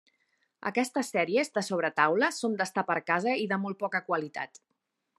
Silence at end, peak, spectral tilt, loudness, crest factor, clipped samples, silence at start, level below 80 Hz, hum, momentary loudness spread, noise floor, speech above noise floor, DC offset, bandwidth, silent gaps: 0.75 s; -8 dBFS; -4.5 dB/octave; -29 LUFS; 22 dB; under 0.1%; 0.6 s; -84 dBFS; none; 7 LU; -79 dBFS; 50 dB; under 0.1%; 13 kHz; none